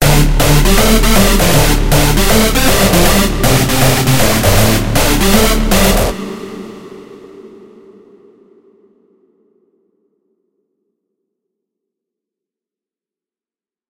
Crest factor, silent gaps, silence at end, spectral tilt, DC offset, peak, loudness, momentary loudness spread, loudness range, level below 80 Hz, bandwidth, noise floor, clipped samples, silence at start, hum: 12 dB; none; 6.45 s; -4 dB/octave; under 0.1%; 0 dBFS; -10 LUFS; 10 LU; 9 LU; -18 dBFS; 17 kHz; under -90 dBFS; under 0.1%; 0 s; none